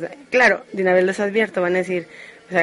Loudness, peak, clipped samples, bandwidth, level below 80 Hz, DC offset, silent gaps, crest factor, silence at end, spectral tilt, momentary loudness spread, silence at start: -19 LUFS; -4 dBFS; under 0.1%; 11.5 kHz; -64 dBFS; under 0.1%; none; 16 dB; 0 s; -5.5 dB/octave; 10 LU; 0 s